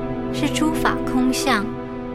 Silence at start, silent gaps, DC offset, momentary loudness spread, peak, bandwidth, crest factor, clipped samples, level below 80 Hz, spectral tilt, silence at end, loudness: 0 s; none; under 0.1%; 7 LU; -2 dBFS; 15.5 kHz; 18 dB; under 0.1%; -36 dBFS; -4.5 dB/octave; 0 s; -21 LUFS